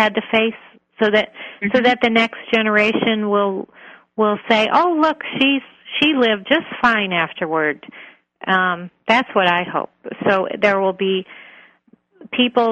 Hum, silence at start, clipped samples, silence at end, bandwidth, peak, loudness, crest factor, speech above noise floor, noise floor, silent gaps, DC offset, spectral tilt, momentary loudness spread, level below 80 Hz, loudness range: none; 0 s; under 0.1%; 0 s; 8.6 kHz; 0 dBFS; -17 LUFS; 18 dB; 38 dB; -55 dBFS; none; under 0.1%; -5.5 dB/octave; 11 LU; -60 dBFS; 3 LU